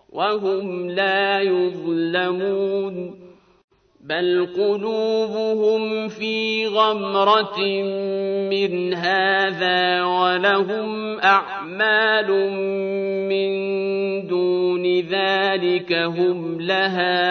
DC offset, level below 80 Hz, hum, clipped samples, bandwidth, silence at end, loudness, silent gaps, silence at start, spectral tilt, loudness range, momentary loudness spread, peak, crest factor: under 0.1%; -68 dBFS; none; under 0.1%; 6.4 kHz; 0 s; -20 LUFS; 3.64-3.68 s; 0.15 s; -6 dB/octave; 4 LU; 7 LU; -4 dBFS; 18 dB